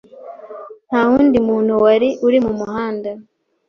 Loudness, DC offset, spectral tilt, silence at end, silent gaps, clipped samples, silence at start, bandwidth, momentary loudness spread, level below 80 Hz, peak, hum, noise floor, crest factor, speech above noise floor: -15 LUFS; under 0.1%; -7 dB/octave; 0.45 s; none; under 0.1%; 0.15 s; 6.6 kHz; 22 LU; -50 dBFS; -2 dBFS; none; -35 dBFS; 14 dB; 21 dB